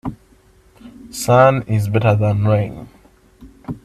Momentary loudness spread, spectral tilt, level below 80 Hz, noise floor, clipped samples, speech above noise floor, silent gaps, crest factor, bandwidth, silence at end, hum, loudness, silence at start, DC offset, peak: 20 LU; -7 dB/octave; -44 dBFS; -51 dBFS; under 0.1%; 36 dB; none; 18 dB; 13.5 kHz; 0.1 s; none; -16 LUFS; 0.05 s; under 0.1%; 0 dBFS